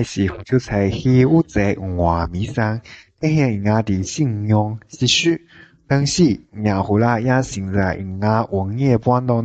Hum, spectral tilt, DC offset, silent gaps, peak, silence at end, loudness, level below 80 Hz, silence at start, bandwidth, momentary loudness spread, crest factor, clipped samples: none; -6 dB/octave; under 0.1%; none; -2 dBFS; 0 s; -18 LUFS; -36 dBFS; 0 s; 9 kHz; 7 LU; 16 dB; under 0.1%